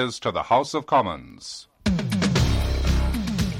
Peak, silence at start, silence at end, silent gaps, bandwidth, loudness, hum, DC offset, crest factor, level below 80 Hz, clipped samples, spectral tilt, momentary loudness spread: -8 dBFS; 0 s; 0 s; none; 16 kHz; -23 LUFS; none; under 0.1%; 14 dB; -30 dBFS; under 0.1%; -5.5 dB/octave; 14 LU